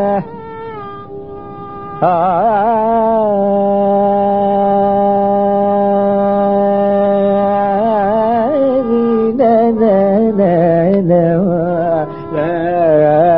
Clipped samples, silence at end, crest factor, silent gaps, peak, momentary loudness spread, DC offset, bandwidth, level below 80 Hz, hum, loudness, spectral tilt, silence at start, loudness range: under 0.1%; 0 s; 12 dB; none; 0 dBFS; 16 LU; 0.9%; 5 kHz; -48 dBFS; none; -12 LUFS; -13.5 dB/octave; 0 s; 2 LU